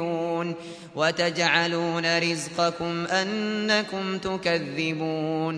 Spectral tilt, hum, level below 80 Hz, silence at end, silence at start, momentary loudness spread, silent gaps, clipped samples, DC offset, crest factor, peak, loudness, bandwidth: -4 dB/octave; none; -62 dBFS; 0 s; 0 s; 7 LU; none; under 0.1%; under 0.1%; 20 dB; -6 dBFS; -25 LUFS; 11 kHz